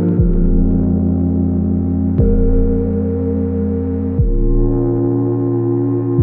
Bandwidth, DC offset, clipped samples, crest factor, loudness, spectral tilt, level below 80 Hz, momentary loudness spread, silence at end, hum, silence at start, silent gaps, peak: 2.1 kHz; under 0.1%; under 0.1%; 12 dB; -16 LUFS; -15.5 dB/octave; -20 dBFS; 3 LU; 0 s; none; 0 s; none; -2 dBFS